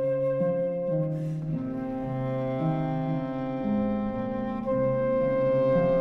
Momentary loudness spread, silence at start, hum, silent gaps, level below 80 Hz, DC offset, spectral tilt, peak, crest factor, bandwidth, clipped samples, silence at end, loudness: 7 LU; 0 s; none; none; -50 dBFS; under 0.1%; -10.5 dB/octave; -14 dBFS; 12 dB; 5.6 kHz; under 0.1%; 0 s; -28 LUFS